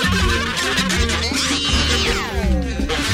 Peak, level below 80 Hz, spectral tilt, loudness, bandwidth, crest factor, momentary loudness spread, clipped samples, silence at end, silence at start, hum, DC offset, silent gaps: -4 dBFS; -24 dBFS; -3.5 dB/octave; -18 LUFS; 16 kHz; 14 dB; 4 LU; under 0.1%; 0 s; 0 s; none; under 0.1%; none